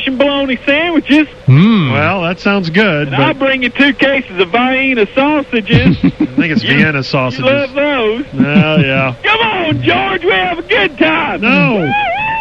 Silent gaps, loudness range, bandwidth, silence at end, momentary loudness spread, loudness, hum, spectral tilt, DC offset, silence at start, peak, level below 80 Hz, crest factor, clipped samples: none; 1 LU; 7.8 kHz; 0 s; 4 LU; -11 LUFS; none; -7.5 dB/octave; under 0.1%; 0 s; 0 dBFS; -38 dBFS; 12 dB; under 0.1%